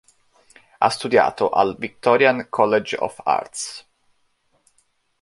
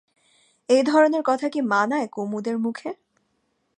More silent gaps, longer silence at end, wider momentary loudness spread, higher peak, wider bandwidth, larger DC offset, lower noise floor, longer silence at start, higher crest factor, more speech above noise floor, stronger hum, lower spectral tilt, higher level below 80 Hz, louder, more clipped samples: neither; first, 1.4 s vs 0.85 s; about the same, 12 LU vs 13 LU; first, -2 dBFS vs -6 dBFS; first, 11.5 kHz vs 10 kHz; neither; second, -65 dBFS vs -71 dBFS; about the same, 0.8 s vs 0.7 s; about the same, 20 dB vs 18 dB; second, 46 dB vs 50 dB; neither; about the same, -4 dB/octave vs -5 dB/octave; first, -62 dBFS vs -78 dBFS; about the same, -20 LUFS vs -22 LUFS; neither